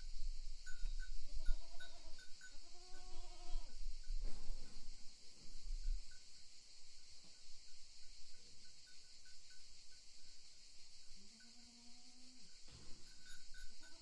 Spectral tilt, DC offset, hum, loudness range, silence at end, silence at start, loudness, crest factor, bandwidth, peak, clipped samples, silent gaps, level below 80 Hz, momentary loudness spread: -2.5 dB/octave; under 0.1%; none; 6 LU; 0 s; 0 s; -57 LUFS; 20 dB; 11 kHz; -22 dBFS; under 0.1%; none; -48 dBFS; 8 LU